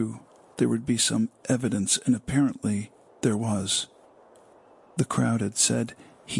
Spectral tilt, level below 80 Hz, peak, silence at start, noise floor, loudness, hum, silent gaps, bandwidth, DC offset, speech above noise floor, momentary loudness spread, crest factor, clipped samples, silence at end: -4 dB/octave; -60 dBFS; -8 dBFS; 0 s; -55 dBFS; -26 LUFS; none; none; 11.5 kHz; under 0.1%; 29 dB; 12 LU; 18 dB; under 0.1%; 0 s